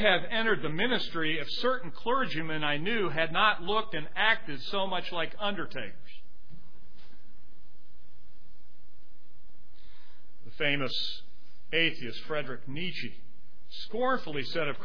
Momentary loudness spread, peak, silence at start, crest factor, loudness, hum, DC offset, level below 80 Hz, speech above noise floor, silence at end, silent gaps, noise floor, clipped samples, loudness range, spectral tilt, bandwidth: 13 LU; -8 dBFS; 0 s; 24 dB; -30 LUFS; none; 4%; -58 dBFS; 31 dB; 0 s; none; -62 dBFS; under 0.1%; 10 LU; -5.5 dB/octave; 5.4 kHz